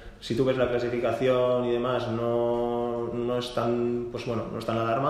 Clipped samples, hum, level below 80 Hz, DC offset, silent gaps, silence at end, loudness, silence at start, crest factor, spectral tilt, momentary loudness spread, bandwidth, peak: under 0.1%; none; -52 dBFS; under 0.1%; none; 0 s; -27 LUFS; 0 s; 16 dB; -7 dB/octave; 7 LU; 12.5 kHz; -10 dBFS